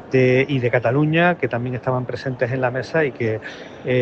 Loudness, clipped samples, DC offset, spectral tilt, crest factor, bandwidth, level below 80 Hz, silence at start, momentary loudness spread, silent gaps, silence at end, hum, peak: -20 LUFS; under 0.1%; under 0.1%; -8 dB/octave; 16 dB; 7.2 kHz; -56 dBFS; 0 s; 9 LU; none; 0 s; none; -4 dBFS